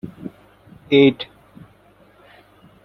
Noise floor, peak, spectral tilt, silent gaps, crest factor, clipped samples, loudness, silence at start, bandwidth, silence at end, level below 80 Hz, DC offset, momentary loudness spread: -52 dBFS; -2 dBFS; -8 dB/octave; none; 20 dB; under 0.1%; -16 LUFS; 0.05 s; 6 kHz; 1.6 s; -58 dBFS; under 0.1%; 23 LU